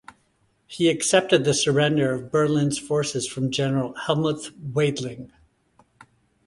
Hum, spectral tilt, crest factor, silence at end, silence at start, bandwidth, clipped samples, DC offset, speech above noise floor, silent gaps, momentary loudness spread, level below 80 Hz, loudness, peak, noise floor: none; -4.5 dB/octave; 20 dB; 1.2 s; 0.7 s; 11.5 kHz; under 0.1%; under 0.1%; 44 dB; none; 11 LU; -60 dBFS; -23 LUFS; -4 dBFS; -66 dBFS